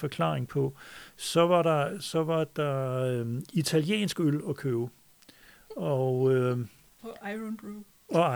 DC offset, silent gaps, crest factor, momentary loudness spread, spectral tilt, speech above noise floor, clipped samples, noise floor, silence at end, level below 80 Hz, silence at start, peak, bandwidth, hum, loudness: under 0.1%; none; 18 dB; 17 LU; -6 dB/octave; 28 dB; under 0.1%; -57 dBFS; 0 s; -68 dBFS; 0 s; -10 dBFS; over 20 kHz; none; -29 LUFS